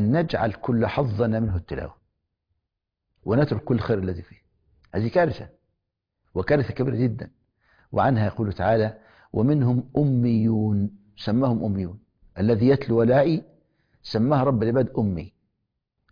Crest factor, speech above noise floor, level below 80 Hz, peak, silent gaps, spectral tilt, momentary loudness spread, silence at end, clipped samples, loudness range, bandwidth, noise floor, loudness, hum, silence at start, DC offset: 16 dB; 60 dB; -48 dBFS; -8 dBFS; none; -10 dB/octave; 13 LU; 0.85 s; under 0.1%; 5 LU; 5.2 kHz; -83 dBFS; -23 LUFS; none; 0 s; under 0.1%